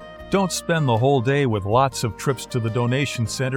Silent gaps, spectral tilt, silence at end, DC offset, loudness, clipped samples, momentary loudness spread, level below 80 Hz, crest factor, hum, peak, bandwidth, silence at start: none; -5.5 dB/octave; 0 s; under 0.1%; -21 LUFS; under 0.1%; 6 LU; -48 dBFS; 16 dB; none; -6 dBFS; 17.5 kHz; 0 s